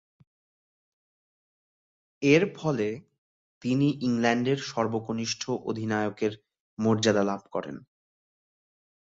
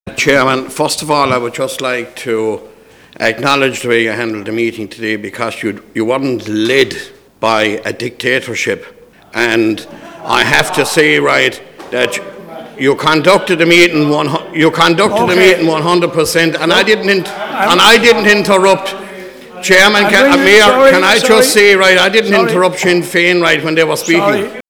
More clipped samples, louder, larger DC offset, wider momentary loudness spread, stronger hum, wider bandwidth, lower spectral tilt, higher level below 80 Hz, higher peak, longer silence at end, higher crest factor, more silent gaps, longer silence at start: second, under 0.1% vs 1%; second, -27 LUFS vs -10 LUFS; neither; about the same, 13 LU vs 14 LU; neither; second, 8 kHz vs over 20 kHz; first, -5.5 dB/octave vs -3.5 dB/octave; second, -66 dBFS vs -46 dBFS; second, -8 dBFS vs 0 dBFS; first, 1.4 s vs 0.1 s; first, 22 dB vs 12 dB; first, 3.18-3.61 s, 6.60-6.77 s vs none; first, 2.2 s vs 0.05 s